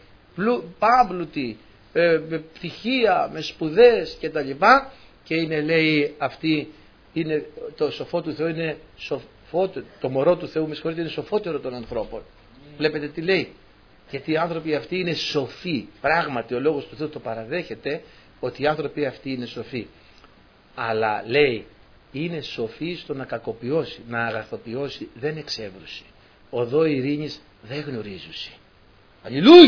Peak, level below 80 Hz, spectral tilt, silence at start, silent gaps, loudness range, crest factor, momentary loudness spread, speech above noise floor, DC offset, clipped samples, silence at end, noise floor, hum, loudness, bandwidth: 0 dBFS; -54 dBFS; -6.5 dB/octave; 0.35 s; none; 9 LU; 22 dB; 15 LU; 31 dB; under 0.1%; under 0.1%; 0 s; -53 dBFS; none; -24 LUFS; 5.4 kHz